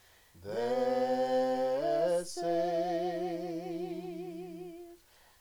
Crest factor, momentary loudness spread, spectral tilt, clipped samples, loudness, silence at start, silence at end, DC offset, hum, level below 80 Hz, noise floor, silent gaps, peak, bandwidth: 14 dB; 15 LU; -5.5 dB/octave; under 0.1%; -33 LUFS; 0.35 s; 0.45 s; under 0.1%; none; -70 dBFS; -59 dBFS; none; -20 dBFS; over 20 kHz